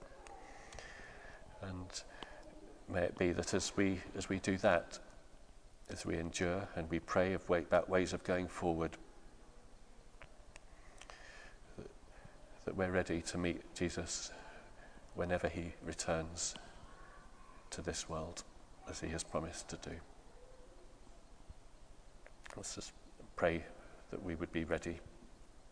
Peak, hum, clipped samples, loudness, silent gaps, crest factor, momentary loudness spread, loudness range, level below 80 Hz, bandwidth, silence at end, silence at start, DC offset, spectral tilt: -16 dBFS; none; under 0.1%; -39 LUFS; none; 26 dB; 24 LU; 12 LU; -58 dBFS; 10.5 kHz; 0 s; 0 s; under 0.1%; -4.5 dB/octave